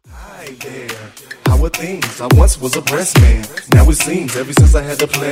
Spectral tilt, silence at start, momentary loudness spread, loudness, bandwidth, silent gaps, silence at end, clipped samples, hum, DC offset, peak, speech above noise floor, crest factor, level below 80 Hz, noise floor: -5 dB/octave; 0.1 s; 18 LU; -13 LUFS; 16.5 kHz; none; 0 s; under 0.1%; none; under 0.1%; 0 dBFS; 21 dB; 12 dB; -16 dBFS; -33 dBFS